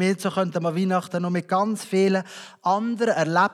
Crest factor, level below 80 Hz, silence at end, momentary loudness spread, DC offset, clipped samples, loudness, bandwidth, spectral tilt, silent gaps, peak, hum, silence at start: 16 dB; -86 dBFS; 0 s; 5 LU; under 0.1%; under 0.1%; -23 LUFS; 13 kHz; -6 dB/octave; none; -6 dBFS; none; 0 s